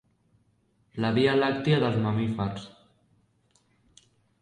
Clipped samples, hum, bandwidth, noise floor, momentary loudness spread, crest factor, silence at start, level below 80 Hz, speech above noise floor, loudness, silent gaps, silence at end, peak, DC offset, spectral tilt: under 0.1%; none; 10 kHz; -68 dBFS; 18 LU; 18 dB; 0.95 s; -60 dBFS; 43 dB; -26 LUFS; none; 1.75 s; -10 dBFS; under 0.1%; -7.5 dB/octave